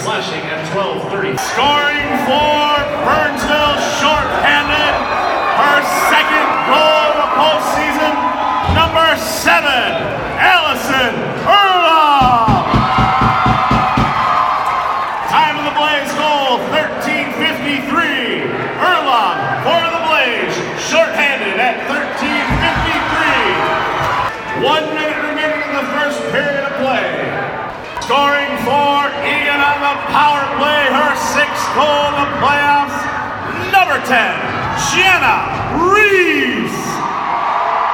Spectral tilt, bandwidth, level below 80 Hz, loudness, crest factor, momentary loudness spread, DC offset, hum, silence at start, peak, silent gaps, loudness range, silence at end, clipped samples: -3.5 dB/octave; 19 kHz; -36 dBFS; -13 LUFS; 14 dB; 8 LU; under 0.1%; none; 0 s; 0 dBFS; none; 4 LU; 0 s; under 0.1%